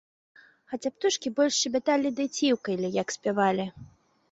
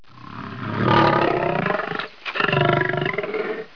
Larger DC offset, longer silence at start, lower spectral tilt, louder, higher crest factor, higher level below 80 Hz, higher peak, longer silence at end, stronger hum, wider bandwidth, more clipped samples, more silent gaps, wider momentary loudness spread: second, under 0.1% vs 0.4%; first, 0.7 s vs 0.15 s; second, -3.5 dB/octave vs -7.5 dB/octave; second, -27 LUFS vs -21 LUFS; about the same, 18 dB vs 18 dB; second, -68 dBFS vs -50 dBFS; second, -10 dBFS vs -4 dBFS; first, 0.45 s vs 0.1 s; neither; first, 8.2 kHz vs 5.4 kHz; neither; neither; second, 9 LU vs 14 LU